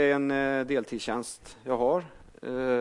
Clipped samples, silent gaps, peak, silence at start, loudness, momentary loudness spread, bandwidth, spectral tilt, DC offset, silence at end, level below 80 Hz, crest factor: under 0.1%; none; -14 dBFS; 0 s; -29 LUFS; 14 LU; 11.5 kHz; -5 dB/octave; under 0.1%; 0 s; -58 dBFS; 14 dB